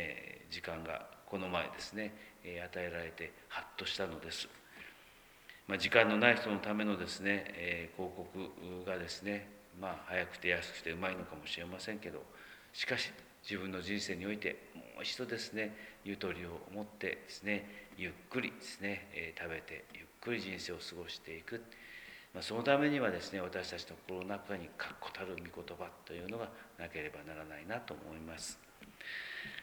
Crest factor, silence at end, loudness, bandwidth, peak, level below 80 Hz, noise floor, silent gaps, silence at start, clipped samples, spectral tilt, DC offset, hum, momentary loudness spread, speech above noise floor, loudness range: 30 dB; 0 s; -39 LUFS; over 20 kHz; -10 dBFS; -68 dBFS; -61 dBFS; none; 0 s; under 0.1%; -4 dB/octave; under 0.1%; none; 14 LU; 21 dB; 11 LU